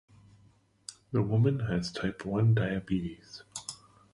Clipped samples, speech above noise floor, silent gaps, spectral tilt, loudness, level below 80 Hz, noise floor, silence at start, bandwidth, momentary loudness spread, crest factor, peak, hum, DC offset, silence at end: under 0.1%; 35 dB; none; -6.5 dB/octave; -30 LUFS; -54 dBFS; -64 dBFS; 0.9 s; 11.5 kHz; 20 LU; 18 dB; -14 dBFS; none; under 0.1%; 0.4 s